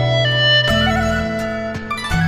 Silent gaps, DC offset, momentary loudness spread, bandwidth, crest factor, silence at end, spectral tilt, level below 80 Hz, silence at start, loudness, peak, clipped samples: none; under 0.1%; 11 LU; 15 kHz; 14 dB; 0 s; -5 dB/octave; -32 dBFS; 0 s; -16 LUFS; -4 dBFS; under 0.1%